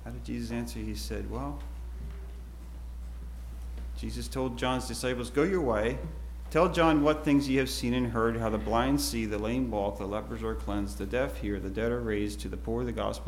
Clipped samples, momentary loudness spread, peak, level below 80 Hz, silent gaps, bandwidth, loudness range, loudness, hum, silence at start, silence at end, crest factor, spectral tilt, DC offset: under 0.1%; 16 LU; -10 dBFS; -40 dBFS; none; 16.5 kHz; 12 LU; -30 LUFS; none; 0 s; 0 s; 20 dB; -5.5 dB/octave; under 0.1%